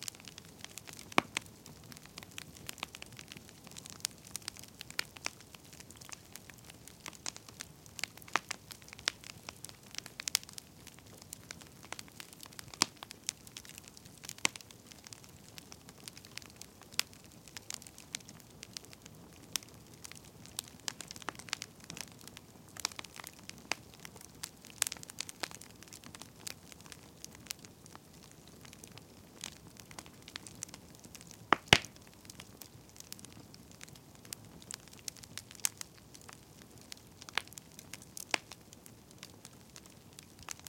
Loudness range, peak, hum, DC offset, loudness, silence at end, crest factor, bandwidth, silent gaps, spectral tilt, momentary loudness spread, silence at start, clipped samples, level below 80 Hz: 14 LU; -2 dBFS; none; under 0.1%; -40 LUFS; 0 s; 40 dB; 17 kHz; none; -1.5 dB/octave; 18 LU; 0 s; under 0.1%; -68 dBFS